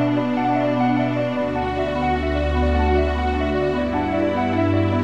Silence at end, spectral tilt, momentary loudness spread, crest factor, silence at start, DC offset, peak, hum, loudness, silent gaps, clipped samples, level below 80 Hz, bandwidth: 0 s; -8 dB/octave; 3 LU; 12 dB; 0 s; 0.6%; -8 dBFS; none; -21 LUFS; none; under 0.1%; -28 dBFS; 8 kHz